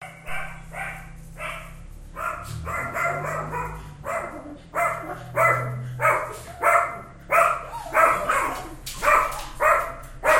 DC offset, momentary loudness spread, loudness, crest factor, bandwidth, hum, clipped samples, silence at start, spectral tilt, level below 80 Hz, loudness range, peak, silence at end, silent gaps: under 0.1%; 16 LU; -24 LUFS; 20 dB; 16.5 kHz; none; under 0.1%; 0 s; -4 dB/octave; -44 dBFS; 9 LU; -4 dBFS; 0 s; none